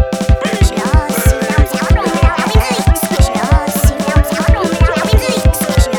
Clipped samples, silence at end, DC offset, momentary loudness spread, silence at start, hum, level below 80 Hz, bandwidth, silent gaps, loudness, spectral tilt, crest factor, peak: under 0.1%; 0 s; 0.2%; 2 LU; 0 s; none; -14 dBFS; 19 kHz; none; -13 LUFS; -5.5 dB/octave; 12 dB; 0 dBFS